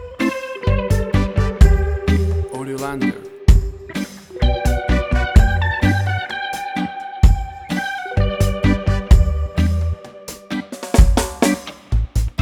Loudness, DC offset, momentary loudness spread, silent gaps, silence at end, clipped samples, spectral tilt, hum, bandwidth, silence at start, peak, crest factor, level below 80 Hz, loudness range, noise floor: -19 LUFS; under 0.1%; 12 LU; none; 0 s; under 0.1%; -6 dB/octave; none; 14.5 kHz; 0 s; 0 dBFS; 16 dB; -18 dBFS; 2 LU; -36 dBFS